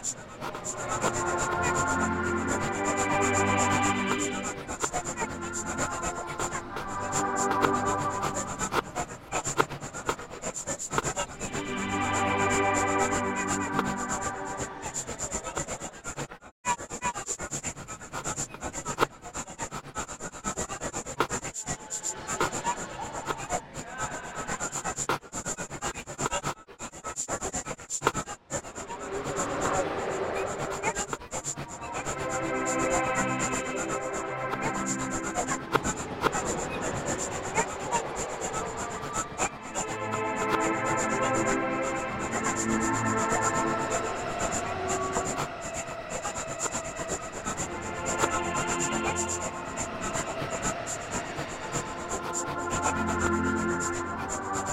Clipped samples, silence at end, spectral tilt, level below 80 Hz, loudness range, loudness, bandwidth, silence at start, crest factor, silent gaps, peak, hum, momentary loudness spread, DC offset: under 0.1%; 0 s; -3.5 dB/octave; -50 dBFS; 6 LU; -30 LUFS; 16 kHz; 0 s; 24 dB; 16.51-16.64 s; -6 dBFS; none; 9 LU; under 0.1%